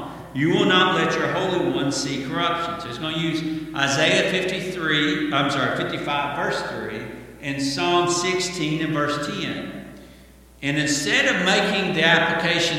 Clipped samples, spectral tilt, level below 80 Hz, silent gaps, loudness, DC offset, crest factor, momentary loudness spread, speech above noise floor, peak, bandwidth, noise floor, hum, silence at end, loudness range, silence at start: under 0.1%; -3.5 dB/octave; -52 dBFS; none; -21 LUFS; under 0.1%; 20 dB; 12 LU; 26 dB; -2 dBFS; 16.5 kHz; -48 dBFS; none; 0 s; 3 LU; 0 s